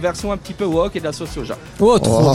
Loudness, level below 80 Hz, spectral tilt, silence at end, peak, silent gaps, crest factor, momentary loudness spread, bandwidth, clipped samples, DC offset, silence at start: -18 LUFS; -36 dBFS; -6 dB/octave; 0 s; -4 dBFS; none; 14 dB; 14 LU; 16 kHz; under 0.1%; under 0.1%; 0 s